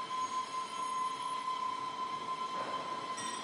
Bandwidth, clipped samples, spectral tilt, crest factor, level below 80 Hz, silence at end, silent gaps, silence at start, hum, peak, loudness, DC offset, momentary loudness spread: 11.5 kHz; under 0.1%; -1.5 dB/octave; 10 dB; -84 dBFS; 0 s; none; 0 s; none; -28 dBFS; -38 LUFS; under 0.1%; 2 LU